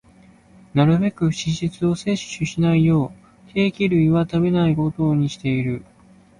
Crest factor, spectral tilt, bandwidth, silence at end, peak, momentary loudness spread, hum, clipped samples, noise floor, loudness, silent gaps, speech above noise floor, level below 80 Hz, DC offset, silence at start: 16 dB; -7 dB/octave; 10.5 kHz; 0.6 s; -4 dBFS; 8 LU; none; under 0.1%; -51 dBFS; -20 LUFS; none; 32 dB; -48 dBFS; under 0.1%; 0.75 s